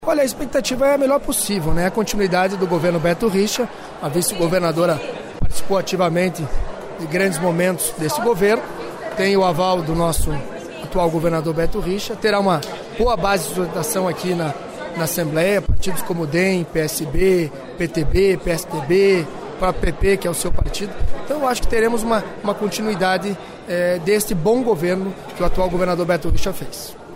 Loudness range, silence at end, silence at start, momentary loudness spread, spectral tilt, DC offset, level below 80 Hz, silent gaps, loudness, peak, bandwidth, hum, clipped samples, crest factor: 2 LU; 0 s; 0 s; 10 LU; -5 dB/octave; under 0.1%; -30 dBFS; none; -20 LUFS; -6 dBFS; 16 kHz; none; under 0.1%; 12 dB